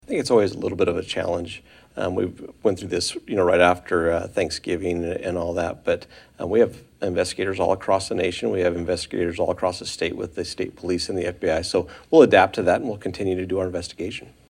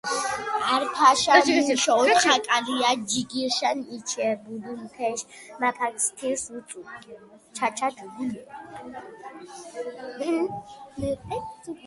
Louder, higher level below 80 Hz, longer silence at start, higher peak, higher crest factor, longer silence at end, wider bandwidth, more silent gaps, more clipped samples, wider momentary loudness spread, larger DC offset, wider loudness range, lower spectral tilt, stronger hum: about the same, -23 LUFS vs -24 LUFS; first, -54 dBFS vs -60 dBFS; about the same, 0.1 s vs 0.05 s; about the same, 0 dBFS vs 0 dBFS; about the same, 22 dB vs 24 dB; first, 0.25 s vs 0 s; first, 15 kHz vs 11.5 kHz; neither; neither; second, 11 LU vs 22 LU; neither; second, 4 LU vs 13 LU; first, -5 dB/octave vs -2 dB/octave; neither